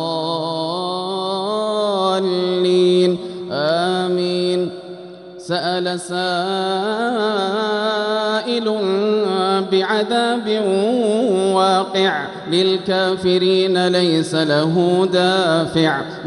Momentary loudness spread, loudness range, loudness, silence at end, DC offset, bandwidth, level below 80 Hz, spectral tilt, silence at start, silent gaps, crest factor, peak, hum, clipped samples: 7 LU; 5 LU; -18 LUFS; 0 s; under 0.1%; 11.5 kHz; -62 dBFS; -5.5 dB/octave; 0 s; none; 14 dB; -2 dBFS; none; under 0.1%